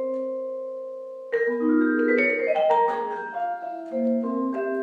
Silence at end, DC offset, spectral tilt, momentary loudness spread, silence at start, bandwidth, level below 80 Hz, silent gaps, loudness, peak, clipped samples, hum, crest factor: 0 s; under 0.1%; -6.5 dB/octave; 12 LU; 0 s; 6.8 kHz; under -90 dBFS; none; -24 LUFS; -10 dBFS; under 0.1%; none; 14 dB